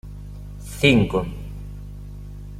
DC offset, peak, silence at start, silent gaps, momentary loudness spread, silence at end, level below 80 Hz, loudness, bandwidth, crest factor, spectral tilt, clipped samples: under 0.1%; -2 dBFS; 0.05 s; none; 22 LU; 0 s; -36 dBFS; -19 LUFS; 16 kHz; 22 dB; -6 dB/octave; under 0.1%